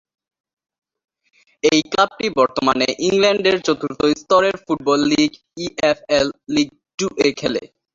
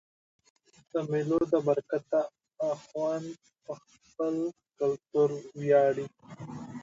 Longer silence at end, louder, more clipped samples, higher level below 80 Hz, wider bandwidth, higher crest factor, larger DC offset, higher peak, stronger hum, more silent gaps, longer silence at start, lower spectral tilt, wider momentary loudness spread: first, 0.3 s vs 0 s; first, -18 LUFS vs -30 LUFS; neither; first, -54 dBFS vs -70 dBFS; about the same, 7.8 kHz vs 7.8 kHz; about the same, 18 dB vs 18 dB; neither; first, -2 dBFS vs -12 dBFS; neither; first, 6.94-6.98 s vs none; first, 1.65 s vs 0.95 s; second, -4 dB/octave vs -7.5 dB/octave; second, 8 LU vs 18 LU